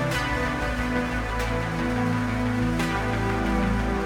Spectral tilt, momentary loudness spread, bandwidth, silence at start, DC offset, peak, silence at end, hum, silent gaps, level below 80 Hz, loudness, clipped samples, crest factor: -6 dB/octave; 2 LU; 16.5 kHz; 0 s; under 0.1%; -12 dBFS; 0 s; none; none; -32 dBFS; -26 LUFS; under 0.1%; 12 dB